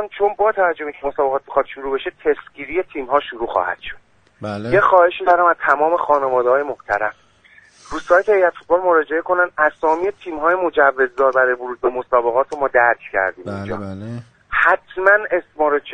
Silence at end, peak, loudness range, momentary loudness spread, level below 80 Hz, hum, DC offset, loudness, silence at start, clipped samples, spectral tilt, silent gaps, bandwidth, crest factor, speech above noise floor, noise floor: 0 s; 0 dBFS; 5 LU; 12 LU; -50 dBFS; none; under 0.1%; -17 LUFS; 0 s; under 0.1%; -6 dB/octave; none; 9.2 kHz; 18 dB; 32 dB; -50 dBFS